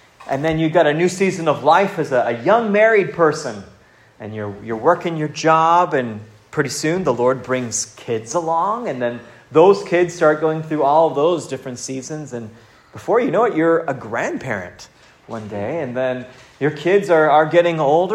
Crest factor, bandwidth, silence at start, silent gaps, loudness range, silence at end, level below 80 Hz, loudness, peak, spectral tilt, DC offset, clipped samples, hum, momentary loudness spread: 18 dB; 13.5 kHz; 0.2 s; none; 5 LU; 0 s; -58 dBFS; -17 LUFS; 0 dBFS; -5 dB/octave; under 0.1%; under 0.1%; none; 15 LU